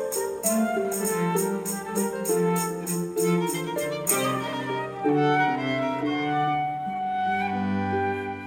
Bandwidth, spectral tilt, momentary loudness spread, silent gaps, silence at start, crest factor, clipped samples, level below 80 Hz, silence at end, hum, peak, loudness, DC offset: 17 kHz; -4.5 dB/octave; 5 LU; none; 0 s; 20 dB; under 0.1%; -64 dBFS; 0 s; none; -6 dBFS; -26 LUFS; under 0.1%